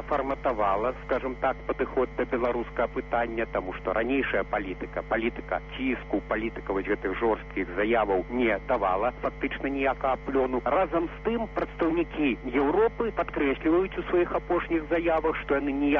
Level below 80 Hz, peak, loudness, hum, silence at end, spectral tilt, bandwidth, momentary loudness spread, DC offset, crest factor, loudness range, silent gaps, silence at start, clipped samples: -44 dBFS; -12 dBFS; -28 LUFS; none; 0 s; -4.5 dB/octave; 6.4 kHz; 5 LU; under 0.1%; 16 dB; 3 LU; none; 0 s; under 0.1%